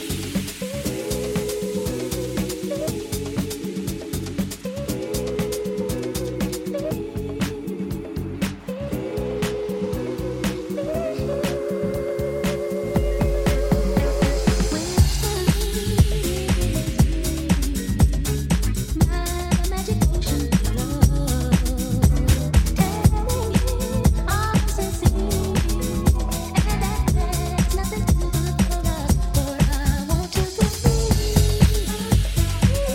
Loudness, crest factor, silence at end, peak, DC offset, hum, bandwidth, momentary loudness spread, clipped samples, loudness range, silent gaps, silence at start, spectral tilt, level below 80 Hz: -23 LUFS; 20 dB; 0 s; -2 dBFS; under 0.1%; none; 17 kHz; 8 LU; under 0.1%; 6 LU; none; 0 s; -5.5 dB/octave; -26 dBFS